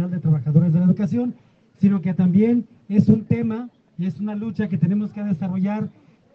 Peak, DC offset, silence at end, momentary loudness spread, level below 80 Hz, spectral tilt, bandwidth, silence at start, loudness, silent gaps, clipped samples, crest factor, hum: -4 dBFS; under 0.1%; 0.45 s; 11 LU; -60 dBFS; -11 dB/octave; 5.6 kHz; 0 s; -21 LUFS; none; under 0.1%; 16 dB; none